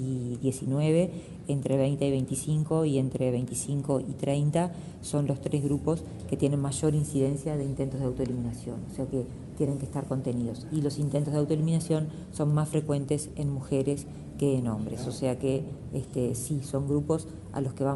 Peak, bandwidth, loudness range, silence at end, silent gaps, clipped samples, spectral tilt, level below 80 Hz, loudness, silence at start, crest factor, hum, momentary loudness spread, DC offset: -12 dBFS; 11.5 kHz; 3 LU; 0 s; none; under 0.1%; -7 dB/octave; -52 dBFS; -30 LUFS; 0 s; 18 dB; none; 7 LU; under 0.1%